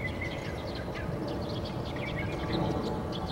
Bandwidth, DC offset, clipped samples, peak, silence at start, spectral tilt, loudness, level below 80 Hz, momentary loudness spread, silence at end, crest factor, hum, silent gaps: 16.5 kHz; under 0.1%; under 0.1%; -18 dBFS; 0 s; -6.5 dB/octave; -34 LUFS; -46 dBFS; 5 LU; 0 s; 16 dB; none; none